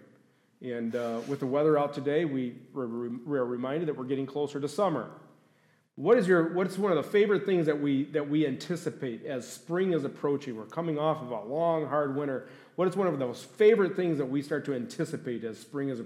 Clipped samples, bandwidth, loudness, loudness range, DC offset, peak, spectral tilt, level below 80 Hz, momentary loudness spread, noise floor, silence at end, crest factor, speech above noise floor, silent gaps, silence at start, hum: under 0.1%; 14 kHz; -29 LUFS; 5 LU; under 0.1%; -12 dBFS; -7 dB/octave; -82 dBFS; 11 LU; -67 dBFS; 0 s; 18 dB; 38 dB; none; 0.6 s; none